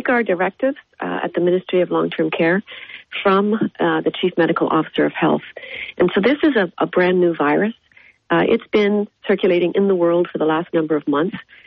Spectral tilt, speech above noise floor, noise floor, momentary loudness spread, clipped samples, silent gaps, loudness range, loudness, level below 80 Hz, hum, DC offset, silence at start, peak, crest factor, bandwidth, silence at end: -4.5 dB/octave; 27 dB; -44 dBFS; 7 LU; under 0.1%; none; 2 LU; -18 LUFS; -58 dBFS; none; under 0.1%; 0 s; -6 dBFS; 12 dB; 5.8 kHz; 0.25 s